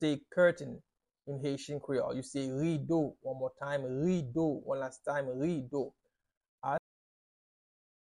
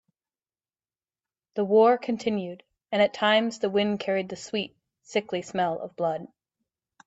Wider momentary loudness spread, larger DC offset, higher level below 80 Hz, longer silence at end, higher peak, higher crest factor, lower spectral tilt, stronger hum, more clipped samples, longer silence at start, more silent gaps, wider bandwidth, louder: about the same, 12 LU vs 11 LU; neither; about the same, -68 dBFS vs -72 dBFS; first, 1.3 s vs 0.8 s; second, -16 dBFS vs -8 dBFS; about the same, 20 dB vs 18 dB; first, -6.5 dB/octave vs -5 dB/octave; neither; neither; second, 0 s vs 1.55 s; first, 6.37-6.41 s, 6.48-6.58 s vs none; first, 11 kHz vs 8 kHz; second, -35 LUFS vs -26 LUFS